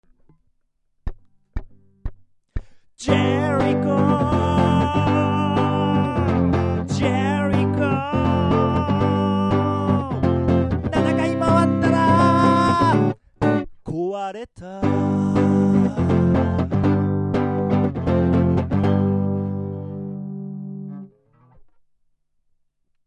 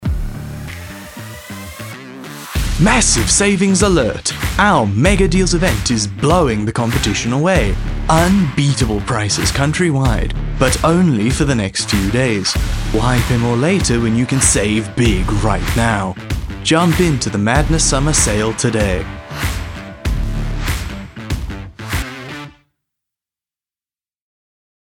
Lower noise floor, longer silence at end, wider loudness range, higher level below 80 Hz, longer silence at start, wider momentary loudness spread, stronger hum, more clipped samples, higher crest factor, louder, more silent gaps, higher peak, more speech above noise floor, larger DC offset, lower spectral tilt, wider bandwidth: second, -66 dBFS vs under -90 dBFS; second, 2 s vs 2.45 s; second, 7 LU vs 10 LU; second, -34 dBFS vs -24 dBFS; first, 1.05 s vs 0 s; about the same, 17 LU vs 16 LU; neither; neither; about the same, 16 dB vs 16 dB; second, -20 LUFS vs -15 LUFS; neither; second, -4 dBFS vs 0 dBFS; second, 47 dB vs over 76 dB; neither; first, -8 dB/octave vs -4.5 dB/octave; second, 9.4 kHz vs 18 kHz